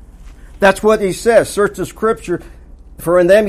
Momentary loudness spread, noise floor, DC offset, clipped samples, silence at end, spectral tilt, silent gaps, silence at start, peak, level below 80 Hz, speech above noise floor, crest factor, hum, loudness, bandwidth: 11 LU; -36 dBFS; under 0.1%; under 0.1%; 0 s; -5 dB/octave; none; 0.2 s; 0 dBFS; -36 dBFS; 23 dB; 14 dB; none; -14 LUFS; 15.5 kHz